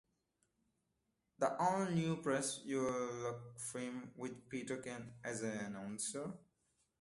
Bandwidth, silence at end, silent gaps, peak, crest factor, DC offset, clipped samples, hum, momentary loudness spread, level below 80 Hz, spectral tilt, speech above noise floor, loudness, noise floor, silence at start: 12 kHz; 0.6 s; none; -20 dBFS; 22 dB; under 0.1%; under 0.1%; none; 11 LU; -76 dBFS; -4.5 dB/octave; 44 dB; -41 LUFS; -85 dBFS; 1.4 s